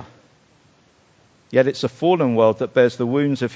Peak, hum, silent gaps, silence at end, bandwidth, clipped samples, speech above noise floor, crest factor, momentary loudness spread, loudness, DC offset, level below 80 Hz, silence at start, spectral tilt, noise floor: -2 dBFS; none; none; 0 s; 8 kHz; under 0.1%; 38 dB; 18 dB; 4 LU; -19 LUFS; under 0.1%; -62 dBFS; 0 s; -7 dB/octave; -56 dBFS